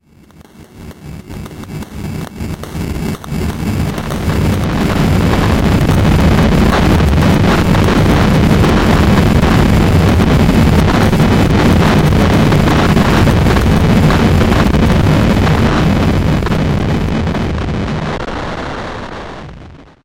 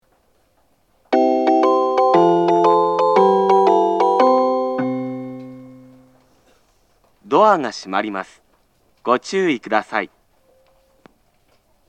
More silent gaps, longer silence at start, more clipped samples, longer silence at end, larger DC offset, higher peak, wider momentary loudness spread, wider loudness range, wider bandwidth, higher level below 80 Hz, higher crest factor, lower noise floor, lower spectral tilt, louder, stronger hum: neither; second, 0.6 s vs 1.1 s; neither; second, 0.35 s vs 1.85 s; neither; about the same, 0 dBFS vs 0 dBFS; about the same, 14 LU vs 15 LU; about the same, 9 LU vs 9 LU; first, 16.5 kHz vs 8.8 kHz; first, -20 dBFS vs -68 dBFS; second, 12 dB vs 18 dB; second, -41 dBFS vs -61 dBFS; about the same, -6.5 dB/octave vs -6 dB/octave; first, -11 LUFS vs -16 LUFS; neither